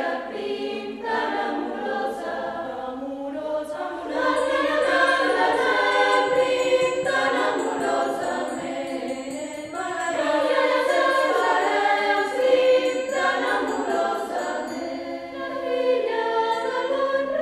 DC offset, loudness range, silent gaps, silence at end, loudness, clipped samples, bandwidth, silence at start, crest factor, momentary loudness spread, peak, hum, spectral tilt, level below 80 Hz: under 0.1%; 7 LU; none; 0 s; -23 LUFS; under 0.1%; 13 kHz; 0 s; 16 dB; 11 LU; -6 dBFS; none; -3 dB/octave; -62 dBFS